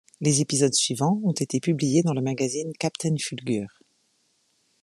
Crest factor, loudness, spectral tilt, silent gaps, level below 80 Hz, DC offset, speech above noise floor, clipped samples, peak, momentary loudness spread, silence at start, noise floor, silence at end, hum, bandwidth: 18 dB; -24 LUFS; -4.5 dB/octave; none; -68 dBFS; under 0.1%; 44 dB; under 0.1%; -8 dBFS; 8 LU; 0.2 s; -68 dBFS; 1.15 s; none; 13 kHz